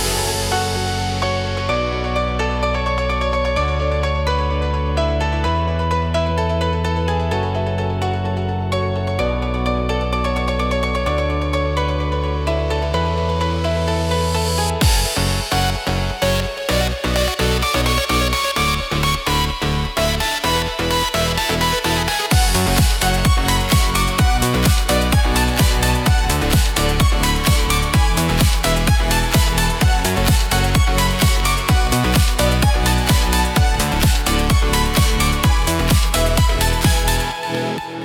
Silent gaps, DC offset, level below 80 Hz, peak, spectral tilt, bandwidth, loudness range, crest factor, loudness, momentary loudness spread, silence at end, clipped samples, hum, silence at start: none; under 0.1%; -22 dBFS; -2 dBFS; -4.5 dB/octave; 19 kHz; 4 LU; 14 dB; -18 LUFS; 5 LU; 0 s; under 0.1%; none; 0 s